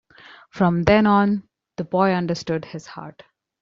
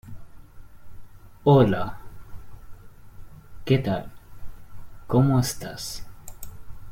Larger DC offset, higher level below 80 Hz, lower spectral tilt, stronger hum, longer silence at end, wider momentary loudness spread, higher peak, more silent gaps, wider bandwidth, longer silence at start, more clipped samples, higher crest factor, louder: neither; about the same, -46 dBFS vs -46 dBFS; about the same, -6 dB/octave vs -6.5 dB/octave; neither; first, 0.5 s vs 0 s; second, 22 LU vs 26 LU; about the same, -2 dBFS vs -4 dBFS; neither; second, 7.4 kHz vs 16.5 kHz; first, 0.55 s vs 0.05 s; neither; about the same, 20 dB vs 22 dB; first, -20 LUFS vs -23 LUFS